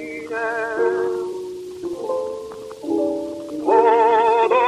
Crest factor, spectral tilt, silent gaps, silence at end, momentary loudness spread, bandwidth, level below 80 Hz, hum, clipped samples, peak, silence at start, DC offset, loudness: 18 dB; -5 dB/octave; none; 0 s; 16 LU; 12 kHz; -62 dBFS; none; under 0.1%; -2 dBFS; 0 s; under 0.1%; -20 LUFS